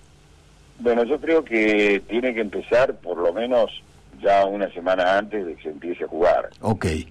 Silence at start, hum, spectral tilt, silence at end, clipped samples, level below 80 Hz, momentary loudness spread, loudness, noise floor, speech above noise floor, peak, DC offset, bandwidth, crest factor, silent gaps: 0.8 s; none; -6 dB/octave; 0 s; under 0.1%; -48 dBFS; 10 LU; -22 LUFS; -51 dBFS; 30 dB; -10 dBFS; under 0.1%; 11 kHz; 10 dB; none